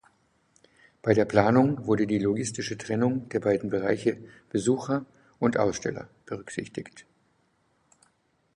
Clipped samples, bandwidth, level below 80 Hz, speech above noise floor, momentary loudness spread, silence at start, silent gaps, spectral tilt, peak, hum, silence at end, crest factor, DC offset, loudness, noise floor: under 0.1%; 11 kHz; -60 dBFS; 43 dB; 17 LU; 1.05 s; none; -6 dB/octave; -4 dBFS; none; 1.55 s; 24 dB; under 0.1%; -27 LUFS; -69 dBFS